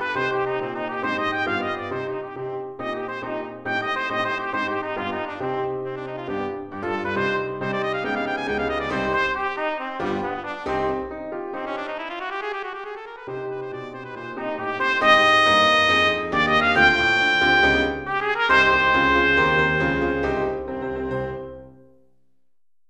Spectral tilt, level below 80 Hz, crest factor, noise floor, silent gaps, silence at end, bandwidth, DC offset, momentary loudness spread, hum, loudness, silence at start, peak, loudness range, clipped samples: -4.5 dB/octave; -46 dBFS; 20 dB; -84 dBFS; none; 1.1 s; 10.5 kHz; under 0.1%; 15 LU; none; -22 LUFS; 0 s; -4 dBFS; 11 LU; under 0.1%